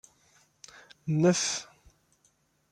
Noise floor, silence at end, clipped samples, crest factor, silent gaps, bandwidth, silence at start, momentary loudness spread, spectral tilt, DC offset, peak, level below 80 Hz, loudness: -70 dBFS; 1.1 s; under 0.1%; 20 dB; none; 11.5 kHz; 1.05 s; 26 LU; -4.5 dB/octave; under 0.1%; -14 dBFS; -68 dBFS; -27 LUFS